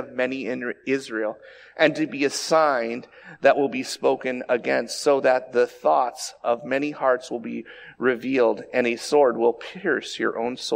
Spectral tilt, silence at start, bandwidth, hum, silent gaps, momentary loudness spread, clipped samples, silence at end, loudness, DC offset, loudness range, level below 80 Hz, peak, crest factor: -3.5 dB/octave; 0 s; 16 kHz; none; none; 10 LU; under 0.1%; 0 s; -23 LUFS; under 0.1%; 2 LU; -70 dBFS; -4 dBFS; 20 dB